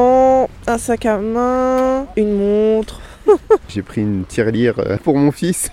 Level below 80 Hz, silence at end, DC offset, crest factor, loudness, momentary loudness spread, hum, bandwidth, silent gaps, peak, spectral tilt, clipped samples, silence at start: -38 dBFS; 0 s; under 0.1%; 14 dB; -16 LUFS; 7 LU; none; 15 kHz; none; 0 dBFS; -6 dB/octave; under 0.1%; 0 s